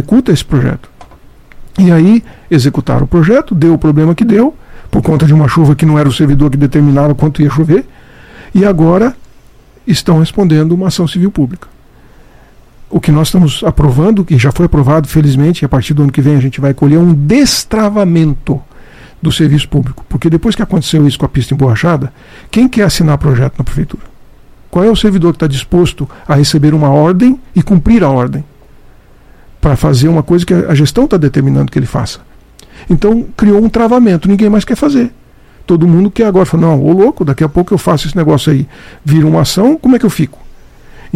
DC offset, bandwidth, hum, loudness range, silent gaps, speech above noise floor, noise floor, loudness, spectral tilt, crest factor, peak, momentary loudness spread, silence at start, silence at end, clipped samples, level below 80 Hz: 0.2%; 15 kHz; none; 3 LU; none; 31 dB; -39 dBFS; -9 LUFS; -7 dB/octave; 10 dB; 0 dBFS; 8 LU; 0 s; 0 s; 2%; -26 dBFS